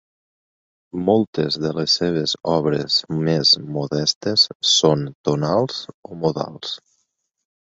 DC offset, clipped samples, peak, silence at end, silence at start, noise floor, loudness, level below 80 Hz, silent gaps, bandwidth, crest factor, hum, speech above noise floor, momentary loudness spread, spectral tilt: under 0.1%; under 0.1%; -2 dBFS; 0.9 s; 0.95 s; -72 dBFS; -19 LUFS; -56 dBFS; 1.27-1.33 s, 4.16-4.21 s, 4.55-4.60 s, 5.15-5.24 s, 5.94-6.03 s; 8 kHz; 20 dB; none; 52 dB; 12 LU; -4.5 dB/octave